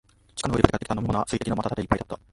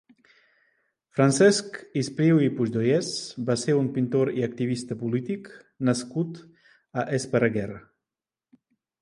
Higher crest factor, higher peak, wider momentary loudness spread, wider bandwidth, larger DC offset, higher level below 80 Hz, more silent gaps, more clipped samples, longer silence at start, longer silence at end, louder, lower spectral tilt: first, 26 dB vs 18 dB; first, 0 dBFS vs -6 dBFS; second, 7 LU vs 13 LU; about the same, 11.5 kHz vs 11.5 kHz; neither; first, -38 dBFS vs -64 dBFS; neither; neither; second, 0.35 s vs 1.15 s; second, 0.15 s vs 1.2 s; about the same, -26 LUFS vs -25 LUFS; about the same, -6 dB/octave vs -5.5 dB/octave